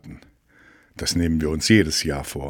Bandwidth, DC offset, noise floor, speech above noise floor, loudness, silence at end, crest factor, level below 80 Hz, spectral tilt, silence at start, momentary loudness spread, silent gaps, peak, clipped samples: 18.5 kHz; under 0.1%; -54 dBFS; 33 dB; -21 LUFS; 0 s; 20 dB; -38 dBFS; -4.5 dB/octave; 0.05 s; 9 LU; none; -2 dBFS; under 0.1%